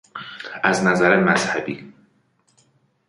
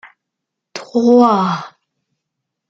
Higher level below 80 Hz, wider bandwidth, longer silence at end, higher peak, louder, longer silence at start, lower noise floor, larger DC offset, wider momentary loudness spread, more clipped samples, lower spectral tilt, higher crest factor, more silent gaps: first, -58 dBFS vs -64 dBFS; first, 11.5 kHz vs 7.6 kHz; first, 1.15 s vs 1 s; about the same, -2 dBFS vs -2 dBFS; second, -18 LUFS vs -14 LUFS; second, 0.15 s vs 0.75 s; second, -63 dBFS vs -79 dBFS; neither; second, 18 LU vs 21 LU; neither; second, -5 dB/octave vs -7 dB/octave; about the same, 20 dB vs 16 dB; neither